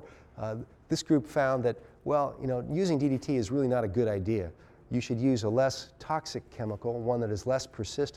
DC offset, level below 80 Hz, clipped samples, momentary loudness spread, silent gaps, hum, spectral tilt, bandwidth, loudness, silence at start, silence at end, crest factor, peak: under 0.1%; -56 dBFS; under 0.1%; 10 LU; none; none; -6.5 dB/octave; 13.5 kHz; -30 LUFS; 0 s; 0.05 s; 16 dB; -14 dBFS